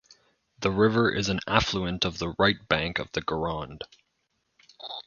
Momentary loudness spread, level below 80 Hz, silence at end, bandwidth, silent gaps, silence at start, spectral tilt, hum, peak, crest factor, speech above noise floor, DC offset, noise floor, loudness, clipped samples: 16 LU; -48 dBFS; 0.05 s; 7.4 kHz; none; 0.6 s; -5 dB/octave; none; -2 dBFS; 28 dB; 49 dB; under 0.1%; -76 dBFS; -26 LUFS; under 0.1%